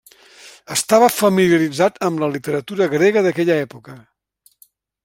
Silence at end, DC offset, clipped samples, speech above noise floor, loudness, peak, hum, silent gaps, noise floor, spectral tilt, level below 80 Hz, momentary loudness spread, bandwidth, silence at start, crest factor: 1.05 s; under 0.1%; under 0.1%; 42 dB; -17 LUFS; 0 dBFS; none; none; -58 dBFS; -4.5 dB/octave; -60 dBFS; 9 LU; 16.5 kHz; 0.45 s; 18 dB